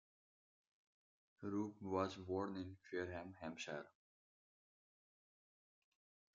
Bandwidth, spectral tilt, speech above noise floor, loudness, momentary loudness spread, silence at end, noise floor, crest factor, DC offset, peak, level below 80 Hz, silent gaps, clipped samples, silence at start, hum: 7.2 kHz; -5 dB/octave; over 44 dB; -47 LUFS; 9 LU; 2.45 s; under -90 dBFS; 24 dB; under 0.1%; -26 dBFS; -86 dBFS; none; under 0.1%; 1.4 s; none